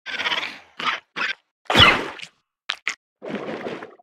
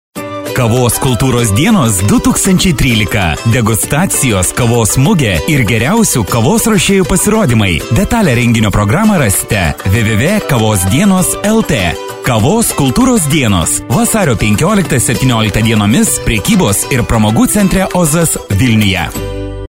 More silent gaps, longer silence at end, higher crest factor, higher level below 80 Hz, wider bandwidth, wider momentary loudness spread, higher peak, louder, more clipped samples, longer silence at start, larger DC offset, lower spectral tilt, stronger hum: first, 1.51-1.65 s, 2.97-3.16 s vs none; about the same, 0.15 s vs 0.1 s; first, 24 dB vs 10 dB; second, -46 dBFS vs -26 dBFS; about the same, 17 kHz vs 16.5 kHz; first, 21 LU vs 3 LU; about the same, 0 dBFS vs 0 dBFS; second, -20 LUFS vs -10 LUFS; neither; about the same, 0.05 s vs 0.15 s; second, under 0.1% vs 0.9%; second, -3 dB/octave vs -4.5 dB/octave; neither